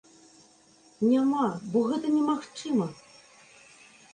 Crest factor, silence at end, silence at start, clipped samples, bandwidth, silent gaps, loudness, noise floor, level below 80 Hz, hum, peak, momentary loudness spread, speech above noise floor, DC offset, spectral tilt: 16 dB; 1.2 s; 1 s; under 0.1%; 9.8 kHz; none; -27 LUFS; -59 dBFS; -74 dBFS; none; -14 dBFS; 6 LU; 33 dB; under 0.1%; -6.5 dB/octave